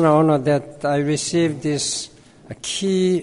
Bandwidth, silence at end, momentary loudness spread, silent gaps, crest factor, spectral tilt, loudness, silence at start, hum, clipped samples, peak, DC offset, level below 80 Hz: 11 kHz; 0 s; 12 LU; none; 16 dB; -5 dB/octave; -20 LUFS; 0 s; none; under 0.1%; -2 dBFS; under 0.1%; -56 dBFS